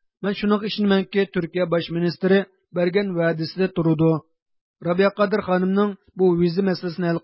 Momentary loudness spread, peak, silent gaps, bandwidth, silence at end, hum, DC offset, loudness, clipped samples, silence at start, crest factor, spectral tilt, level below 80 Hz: 5 LU; -6 dBFS; 4.42-4.46 s, 4.61-4.74 s; 5.8 kHz; 0.05 s; none; under 0.1%; -22 LUFS; under 0.1%; 0.2 s; 16 dB; -11.5 dB/octave; -56 dBFS